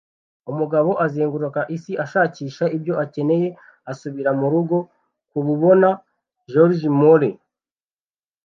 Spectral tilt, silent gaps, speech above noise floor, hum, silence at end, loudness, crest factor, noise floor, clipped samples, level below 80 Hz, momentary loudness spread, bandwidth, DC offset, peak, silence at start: -9 dB/octave; none; over 72 dB; none; 1.15 s; -19 LUFS; 18 dB; under -90 dBFS; under 0.1%; -72 dBFS; 16 LU; 7.2 kHz; under 0.1%; -2 dBFS; 0.45 s